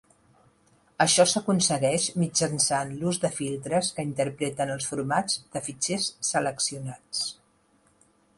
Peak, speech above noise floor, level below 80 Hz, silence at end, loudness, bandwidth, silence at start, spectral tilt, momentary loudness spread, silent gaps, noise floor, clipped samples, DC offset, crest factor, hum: -8 dBFS; 38 dB; -64 dBFS; 1.05 s; -26 LUFS; 11.5 kHz; 1 s; -3 dB/octave; 9 LU; none; -64 dBFS; under 0.1%; under 0.1%; 20 dB; none